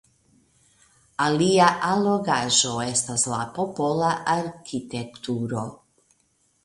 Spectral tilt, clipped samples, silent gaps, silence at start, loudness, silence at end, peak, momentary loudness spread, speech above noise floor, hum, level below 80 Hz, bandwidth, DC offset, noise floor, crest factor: -3.5 dB/octave; under 0.1%; none; 1.2 s; -23 LUFS; 0.9 s; -2 dBFS; 13 LU; 44 dB; none; -60 dBFS; 11.5 kHz; under 0.1%; -67 dBFS; 22 dB